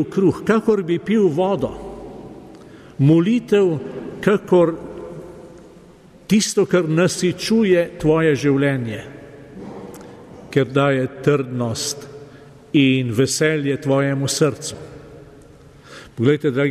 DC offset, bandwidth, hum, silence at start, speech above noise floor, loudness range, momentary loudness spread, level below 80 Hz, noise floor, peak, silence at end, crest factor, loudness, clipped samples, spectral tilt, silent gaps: under 0.1%; 14.5 kHz; none; 0 s; 28 dB; 4 LU; 21 LU; -50 dBFS; -46 dBFS; -4 dBFS; 0 s; 16 dB; -18 LUFS; under 0.1%; -5.5 dB/octave; none